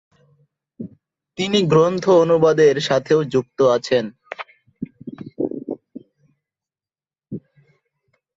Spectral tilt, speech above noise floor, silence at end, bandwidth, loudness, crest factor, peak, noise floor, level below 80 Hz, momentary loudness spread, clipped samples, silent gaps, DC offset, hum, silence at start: -6 dB/octave; over 74 dB; 1 s; 7.8 kHz; -17 LUFS; 18 dB; -2 dBFS; under -90 dBFS; -60 dBFS; 22 LU; under 0.1%; none; under 0.1%; none; 0.8 s